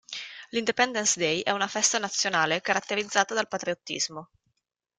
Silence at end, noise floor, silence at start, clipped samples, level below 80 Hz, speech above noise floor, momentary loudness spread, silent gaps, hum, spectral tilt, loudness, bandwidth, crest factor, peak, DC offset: 0.75 s; -79 dBFS; 0.1 s; under 0.1%; -72 dBFS; 52 dB; 8 LU; none; none; -1.5 dB/octave; -26 LUFS; 11 kHz; 22 dB; -8 dBFS; under 0.1%